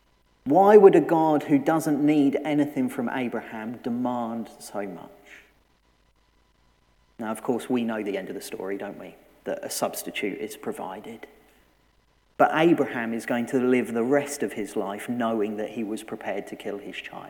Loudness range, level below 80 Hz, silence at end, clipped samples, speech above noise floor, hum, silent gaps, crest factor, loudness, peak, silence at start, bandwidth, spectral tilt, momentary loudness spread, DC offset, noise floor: 13 LU; -66 dBFS; 0 s; under 0.1%; 40 dB; none; none; 22 dB; -24 LUFS; -2 dBFS; 0.45 s; 18.5 kHz; -5.5 dB/octave; 15 LU; under 0.1%; -64 dBFS